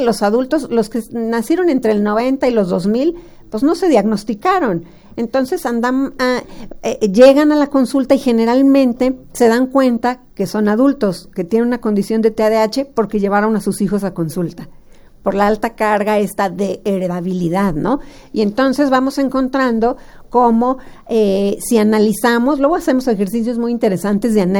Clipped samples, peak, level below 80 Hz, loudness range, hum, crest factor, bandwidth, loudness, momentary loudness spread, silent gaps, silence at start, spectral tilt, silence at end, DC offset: under 0.1%; 0 dBFS; -42 dBFS; 5 LU; none; 14 dB; over 20 kHz; -15 LUFS; 8 LU; none; 0 s; -6 dB/octave; 0 s; under 0.1%